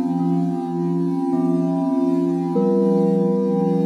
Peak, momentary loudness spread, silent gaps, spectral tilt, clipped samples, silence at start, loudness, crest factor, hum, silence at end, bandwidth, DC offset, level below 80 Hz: -8 dBFS; 4 LU; none; -10 dB/octave; under 0.1%; 0 s; -20 LUFS; 12 dB; none; 0 s; 8.8 kHz; under 0.1%; -68 dBFS